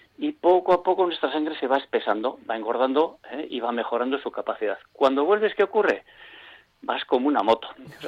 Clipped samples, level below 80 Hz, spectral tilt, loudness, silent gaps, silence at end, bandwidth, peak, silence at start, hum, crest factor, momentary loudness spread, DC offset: under 0.1%; -66 dBFS; -5.5 dB/octave; -24 LUFS; none; 0 s; 7.8 kHz; -8 dBFS; 0.2 s; none; 16 dB; 10 LU; under 0.1%